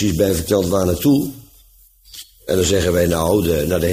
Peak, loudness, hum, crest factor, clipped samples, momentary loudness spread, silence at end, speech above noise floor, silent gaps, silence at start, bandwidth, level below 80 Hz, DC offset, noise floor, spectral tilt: -4 dBFS; -17 LUFS; none; 14 dB; under 0.1%; 17 LU; 0 s; 33 dB; none; 0 s; 15.5 kHz; -36 dBFS; under 0.1%; -50 dBFS; -5.5 dB/octave